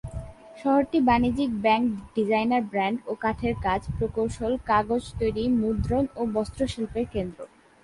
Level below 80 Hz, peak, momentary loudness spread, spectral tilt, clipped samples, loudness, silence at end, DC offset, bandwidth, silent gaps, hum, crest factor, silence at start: -42 dBFS; -8 dBFS; 9 LU; -7 dB/octave; under 0.1%; -26 LUFS; 0.4 s; under 0.1%; 11.5 kHz; none; none; 16 dB; 0.05 s